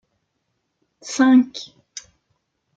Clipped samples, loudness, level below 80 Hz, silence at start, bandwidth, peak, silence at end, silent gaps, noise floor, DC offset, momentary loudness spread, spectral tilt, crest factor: under 0.1%; -17 LUFS; -72 dBFS; 1.05 s; 7.8 kHz; -4 dBFS; 1.1 s; none; -74 dBFS; under 0.1%; 23 LU; -3 dB/octave; 18 dB